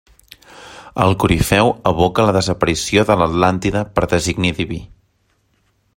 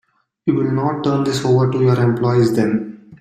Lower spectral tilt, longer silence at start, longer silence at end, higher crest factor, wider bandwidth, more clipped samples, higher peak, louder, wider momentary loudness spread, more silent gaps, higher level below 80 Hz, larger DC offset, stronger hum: second, -5 dB/octave vs -7.5 dB/octave; about the same, 0.55 s vs 0.45 s; first, 1.1 s vs 0.05 s; about the same, 16 dB vs 14 dB; first, 16.5 kHz vs 14 kHz; neither; first, 0 dBFS vs -4 dBFS; about the same, -16 LUFS vs -17 LUFS; first, 9 LU vs 6 LU; neither; first, -36 dBFS vs -54 dBFS; neither; neither